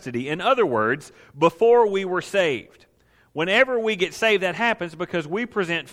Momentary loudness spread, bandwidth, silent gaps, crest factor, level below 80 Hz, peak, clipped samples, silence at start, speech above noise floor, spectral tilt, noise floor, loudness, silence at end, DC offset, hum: 10 LU; 14.5 kHz; none; 18 dB; -62 dBFS; -4 dBFS; under 0.1%; 0.05 s; 38 dB; -4.5 dB/octave; -60 dBFS; -21 LUFS; 0 s; under 0.1%; none